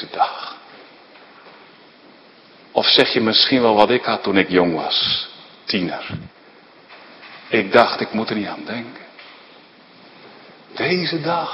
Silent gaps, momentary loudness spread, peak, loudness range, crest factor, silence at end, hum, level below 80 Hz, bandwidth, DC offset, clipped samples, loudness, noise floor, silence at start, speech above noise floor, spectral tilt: none; 22 LU; 0 dBFS; 7 LU; 20 dB; 0 s; none; -60 dBFS; 11 kHz; under 0.1%; under 0.1%; -17 LUFS; -47 dBFS; 0 s; 29 dB; -6 dB/octave